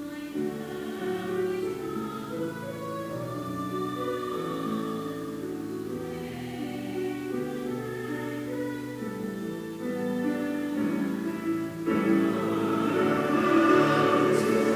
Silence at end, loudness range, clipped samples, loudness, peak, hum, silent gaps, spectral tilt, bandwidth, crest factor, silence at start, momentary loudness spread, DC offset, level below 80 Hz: 0 s; 9 LU; under 0.1%; -29 LUFS; -10 dBFS; none; none; -6 dB/octave; 16 kHz; 20 dB; 0 s; 12 LU; under 0.1%; -62 dBFS